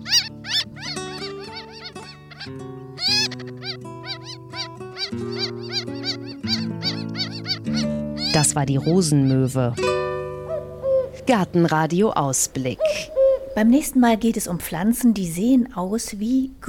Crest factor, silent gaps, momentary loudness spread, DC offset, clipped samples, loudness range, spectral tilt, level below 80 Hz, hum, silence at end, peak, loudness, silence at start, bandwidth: 18 dB; none; 14 LU; under 0.1%; under 0.1%; 7 LU; -4.5 dB/octave; -50 dBFS; none; 0 s; -4 dBFS; -22 LUFS; 0 s; 17.5 kHz